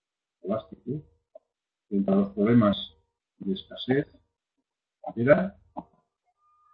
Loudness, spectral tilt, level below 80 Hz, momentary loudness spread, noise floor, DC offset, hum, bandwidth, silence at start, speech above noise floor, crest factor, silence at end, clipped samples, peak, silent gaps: -26 LUFS; -10.5 dB/octave; -60 dBFS; 19 LU; -84 dBFS; under 0.1%; none; 5.2 kHz; 0.45 s; 59 dB; 24 dB; 0.9 s; under 0.1%; -6 dBFS; none